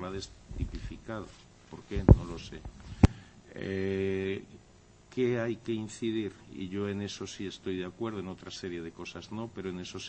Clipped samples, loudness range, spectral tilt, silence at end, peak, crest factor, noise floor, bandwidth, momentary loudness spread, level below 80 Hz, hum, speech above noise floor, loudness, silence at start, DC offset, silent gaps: under 0.1%; 8 LU; -7 dB/octave; 0 s; -4 dBFS; 28 dB; -58 dBFS; 8.4 kHz; 16 LU; -40 dBFS; none; 26 dB; -33 LUFS; 0 s; under 0.1%; none